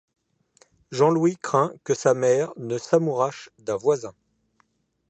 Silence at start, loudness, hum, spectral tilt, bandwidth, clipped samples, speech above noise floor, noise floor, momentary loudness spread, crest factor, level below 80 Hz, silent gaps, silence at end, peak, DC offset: 0.9 s; -23 LUFS; none; -6 dB/octave; 8.6 kHz; under 0.1%; 45 dB; -68 dBFS; 11 LU; 20 dB; -70 dBFS; none; 1 s; -6 dBFS; under 0.1%